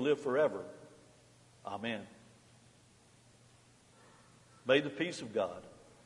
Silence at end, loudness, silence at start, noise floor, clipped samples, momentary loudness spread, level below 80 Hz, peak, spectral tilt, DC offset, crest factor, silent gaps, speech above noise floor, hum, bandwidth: 0.3 s; -35 LUFS; 0 s; -64 dBFS; under 0.1%; 21 LU; -78 dBFS; -14 dBFS; -5 dB/octave; under 0.1%; 24 dB; none; 30 dB; none; 11.5 kHz